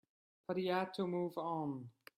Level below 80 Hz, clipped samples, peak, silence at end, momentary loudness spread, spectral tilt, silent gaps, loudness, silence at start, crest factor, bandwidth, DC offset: -82 dBFS; under 0.1%; -24 dBFS; 0.25 s; 9 LU; -7.5 dB/octave; none; -40 LUFS; 0.5 s; 18 dB; 15 kHz; under 0.1%